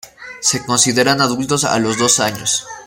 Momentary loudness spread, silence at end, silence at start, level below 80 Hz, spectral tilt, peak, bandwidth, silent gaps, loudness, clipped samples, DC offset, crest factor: 6 LU; 0 s; 0.05 s; -52 dBFS; -2.5 dB/octave; 0 dBFS; 17 kHz; none; -15 LUFS; under 0.1%; under 0.1%; 16 dB